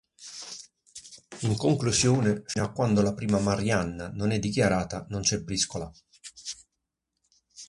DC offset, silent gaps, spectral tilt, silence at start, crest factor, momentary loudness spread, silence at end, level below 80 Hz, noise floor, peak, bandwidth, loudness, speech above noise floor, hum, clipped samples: under 0.1%; none; -4.5 dB/octave; 0.2 s; 18 dB; 21 LU; 0.05 s; -50 dBFS; -83 dBFS; -10 dBFS; 11.5 kHz; -27 LUFS; 57 dB; none; under 0.1%